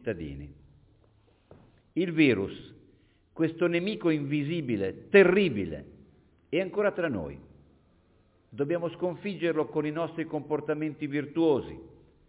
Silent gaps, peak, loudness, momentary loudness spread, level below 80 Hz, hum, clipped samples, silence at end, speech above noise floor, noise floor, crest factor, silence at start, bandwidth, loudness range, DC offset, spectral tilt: none; -8 dBFS; -28 LUFS; 18 LU; -58 dBFS; none; under 0.1%; 0.4 s; 37 dB; -64 dBFS; 22 dB; 0.05 s; 4 kHz; 6 LU; under 0.1%; -5.5 dB/octave